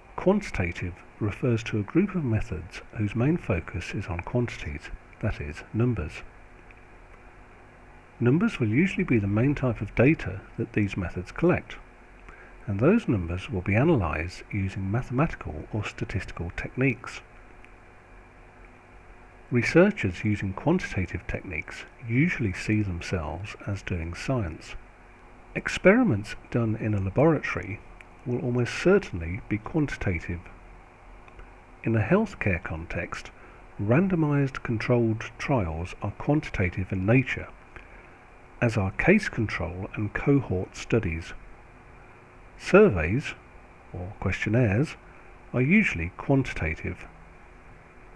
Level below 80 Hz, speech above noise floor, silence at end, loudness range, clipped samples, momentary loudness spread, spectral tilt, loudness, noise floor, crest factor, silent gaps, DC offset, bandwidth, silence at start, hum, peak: -44 dBFS; 24 dB; 0 s; 6 LU; under 0.1%; 15 LU; -7.5 dB/octave; -27 LUFS; -50 dBFS; 22 dB; none; under 0.1%; 11 kHz; 0.1 s; none; -4 dBFS